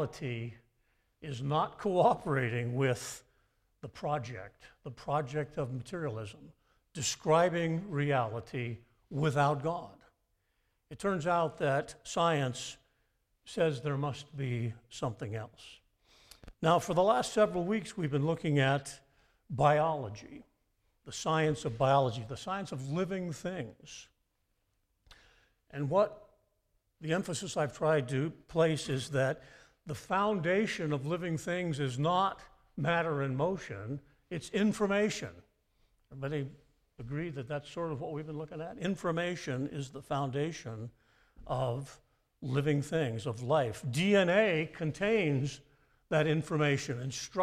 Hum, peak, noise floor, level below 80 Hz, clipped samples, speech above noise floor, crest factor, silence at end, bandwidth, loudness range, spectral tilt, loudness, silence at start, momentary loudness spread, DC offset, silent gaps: none; -14 dBFS; -78 dBFS; -64 dBFS; under 0.1%; 46 dB; 20 dB; 0 s; 14.5 kHz; 7 LU; -5.5 dB/octave; -33 LUFS; 0 s; 16 LU; under 0.1%; none